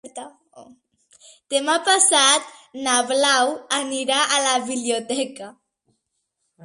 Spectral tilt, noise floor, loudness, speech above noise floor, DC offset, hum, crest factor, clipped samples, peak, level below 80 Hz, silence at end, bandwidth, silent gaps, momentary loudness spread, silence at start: 0.5 dB/octave; -75 dBFS; -19 LUFS; 55 dB; under 0.1%; none; 20 dB; under 0.1%; -2 dBFS; -74 dBFS; 0 s; 11.5 kHz; none; 20 LU; 0.05 s